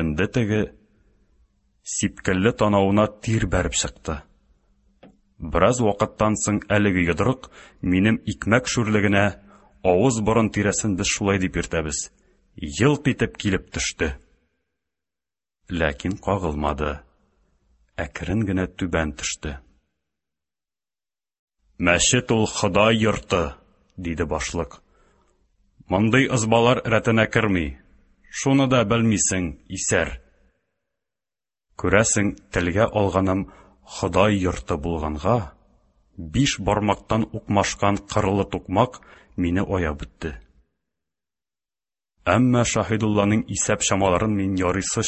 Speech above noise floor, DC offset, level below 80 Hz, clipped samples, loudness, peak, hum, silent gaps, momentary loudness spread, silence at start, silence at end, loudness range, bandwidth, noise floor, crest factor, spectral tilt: over 69 dB; under 0.1%; -40 dBFS; under 0.1%; -22 LUFS; 0 dBFS; none; 21.39-21.47 s; 12 LU; 0 s; 0 s; 7 LU; 8.6 kHz; under -90 dBFS; 22 dB; -4.5 dB/octave